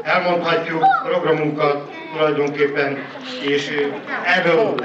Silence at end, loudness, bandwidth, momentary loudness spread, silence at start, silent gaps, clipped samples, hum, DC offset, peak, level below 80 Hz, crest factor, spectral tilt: 0 s; -19 LUFS; 8 kHz; 8 LU; 0 s; none; under 0.1%; none; under 0.1%; -6 dBFS; -68 dBFS; 12 dB; -5.5 dB/octave